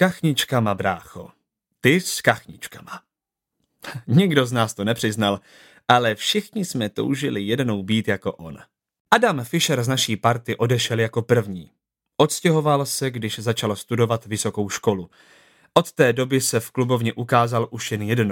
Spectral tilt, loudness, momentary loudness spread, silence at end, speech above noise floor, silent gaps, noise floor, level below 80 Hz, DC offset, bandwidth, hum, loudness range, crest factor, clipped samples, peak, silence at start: -4.5 dB/octave; -21 LUFS; 15 LU; 0 s; 63 dB; 9.00-9.05 s; -85 dBFS; -62 dBFS; under 0.1%; 17 kHz; none; 3 LU; 22 dB; under 0.1%; 0 dBFS; 0 s